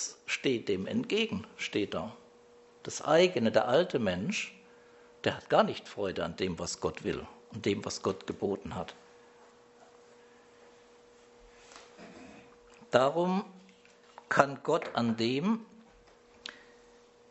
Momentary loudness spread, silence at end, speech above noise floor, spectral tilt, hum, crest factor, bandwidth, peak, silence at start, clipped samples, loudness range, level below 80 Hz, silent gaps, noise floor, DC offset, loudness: 20 LU; 0.75 s; 29 dB; -4.5 dB/octave; none; 30 dB; 8.2 kHz; -4 dBFS; 0 s; under 0.1%; 8 LU; -66 dBFS; none; -60 dBFS; under 0.1%; -31 LUFS